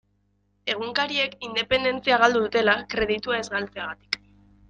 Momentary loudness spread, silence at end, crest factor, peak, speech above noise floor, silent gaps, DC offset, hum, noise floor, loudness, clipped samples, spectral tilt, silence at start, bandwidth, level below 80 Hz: 12 LU; 0.55 s; 22 dB; -4 dBFS; 44 dB; none; under 0.1%; 50 Hz at -45 dBFS; -68 dBFS; -24 LUFS; under 0.1%; -3.5 dB/octave; 0.65 s; 9.4 kHz; -54 dBFS